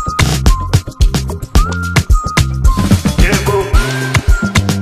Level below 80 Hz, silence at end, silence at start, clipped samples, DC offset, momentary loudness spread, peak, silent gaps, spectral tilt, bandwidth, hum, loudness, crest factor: -14 dBFS; 0 s; 0 s; 0.1%; under 0.1%; 3 LU; 0 dBFS; none; -5 dB/octave; 15.5 kHz; none; -13 LUFS; 12 dB